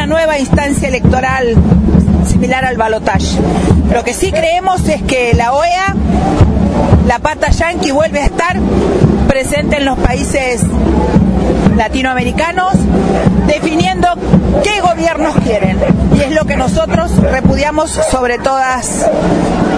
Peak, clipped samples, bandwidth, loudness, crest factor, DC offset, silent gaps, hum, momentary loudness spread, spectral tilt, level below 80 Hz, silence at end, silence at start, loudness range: 0 dBFS; 0.3%; 11 kHz; -11 LUFS; 10 dB; under 0.1%; none; none; 3 LU; -6 dB/octave; -20 dBFS; 0 s; 0 s; 1 LU